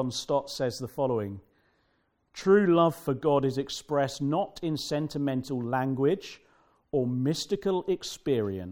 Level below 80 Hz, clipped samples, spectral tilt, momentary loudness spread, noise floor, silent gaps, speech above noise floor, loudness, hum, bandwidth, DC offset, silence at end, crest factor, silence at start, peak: -62 dBFS; under 0.1%; -6 dB/octave; 9 LU; -72 dBFS; none; 44 dB; -28 LUFS; none; 18 kHz; under 0.1%; 0 s; 18 dB; 0 s; -10 dBFS